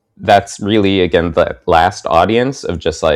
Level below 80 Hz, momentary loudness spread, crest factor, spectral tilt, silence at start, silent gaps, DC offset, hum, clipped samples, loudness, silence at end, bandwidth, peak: -38 dBFS; 5 LU; 14 dB; -5.5 dB/octave; 0.2 s; none; under 0.1%; none; 0.6%; -13 LUFS; 0 s; 13.5 kHz; 0 dBFS